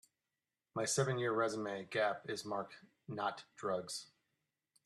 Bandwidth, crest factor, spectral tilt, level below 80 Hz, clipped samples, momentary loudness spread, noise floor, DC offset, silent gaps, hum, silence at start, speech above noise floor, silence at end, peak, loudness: 13 kHz; 20 dB; -4 dB/octave; -82 dBFS; under 0.1%; 12 LU; under -90 dBFS; under 0.1%; none; none; 0.75 s; over 51 dB; 0.8 s; -20 dBFS; -39 LUFS